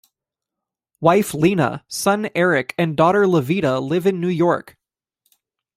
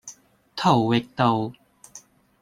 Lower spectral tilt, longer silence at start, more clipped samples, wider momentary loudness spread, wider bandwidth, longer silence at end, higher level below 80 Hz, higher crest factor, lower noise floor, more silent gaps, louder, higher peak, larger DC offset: about the same, -6 dB/octave vs -6 dB/octave; first, 1 s vs 0.05 s; neither; second, 5 LU vs 17 LU; first, 16 kHz vs 13 kHz; first, 1.15 s vs 0.45 s; about the same, -58 dBFS vs -60 dBFS; about the same, 18 dB vs 20 dB; first, -85 dBFS vs -50 dBFS; neither; first, -18 LUFS vs -22 LUFS; about the same, -2 dBFS vs -4 dBFS; neither